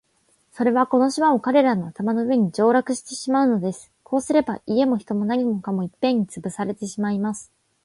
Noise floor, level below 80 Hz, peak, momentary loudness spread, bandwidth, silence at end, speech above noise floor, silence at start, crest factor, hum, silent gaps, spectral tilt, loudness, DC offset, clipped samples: -64 dBFS; -64 dBFS; -4 dBFS; 10 LU; 11.5 kHz; 0.4 s; 43 dB; 0.55 s; 18 dB; none; none; -6 dB/octave; -22 LUFS; under 0.1%; under 0.1%